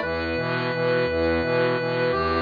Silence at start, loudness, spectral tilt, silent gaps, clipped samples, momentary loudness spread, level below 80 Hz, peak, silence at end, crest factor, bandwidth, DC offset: 0 s; -23 LUFS; -7.5 dB/octave; none; under 0.1%; 3 LU; -44 dBFS; -12 dBFS; 0 s; 12 dB; 5 kHz; under 0.1%